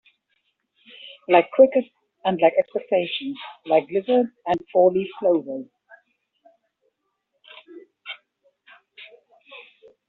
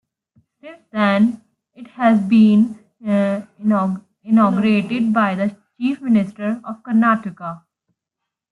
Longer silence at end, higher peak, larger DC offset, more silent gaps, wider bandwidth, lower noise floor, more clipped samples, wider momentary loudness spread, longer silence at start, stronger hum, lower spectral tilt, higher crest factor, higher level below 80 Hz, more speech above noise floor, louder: second, 0.45 s vs 0.95 s; about the same, -2 dBFS vs -4 dBFS; neither; neither; about the same, 4.3 kHz vs 4.7 kHz; second, -75 dBFS vs -82 dBFS; neither; first, 26 LU vs 15 LU; first, 1.05 s vs 0.65 s; neither; second, -3.5 dB/octave vs -8 dB/octave; first, 22 dB vs 14 dB; second, -70 dBFS vs -64 dBFS; second, 55 dB vs 66 dB; second, -21 LUFS vs -18 LUFS